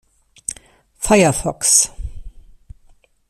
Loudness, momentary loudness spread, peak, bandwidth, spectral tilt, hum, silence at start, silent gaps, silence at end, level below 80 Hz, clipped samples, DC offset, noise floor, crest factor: -15 LUFS; 22 LU; 0 dBFS; 15.5 kHz; -3 dB/octave; none; 0.5 s; none; 1 s; -36 dBFS; under 0.1%; under 0.1%; -52 dBFS; 20 dB